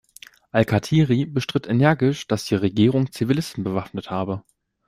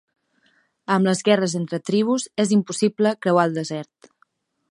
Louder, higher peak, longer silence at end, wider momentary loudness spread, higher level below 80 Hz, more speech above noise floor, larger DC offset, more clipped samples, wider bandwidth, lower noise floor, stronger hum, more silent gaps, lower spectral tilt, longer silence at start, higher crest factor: about the same, -22 LUFS vs -21 LUFS; about the same, -2 dBFS vs -2 dBFS; second, 0.5 s vs 0.9 s; about the same, 9 LU vs 11 LU; first, -52 dBFS vs -70 dBFS; second, 27 dB vs 44 dB; neither; neither; first, 15.5 kHz vs 11.5 kHz; second, -48 dBFS vs -65 dBFS; neither; neither; first, -7 dB/octave vs -5.5 dB/octave; second, 0.55 s vs 0.9 s; about the same, 18 dB vs 20 dB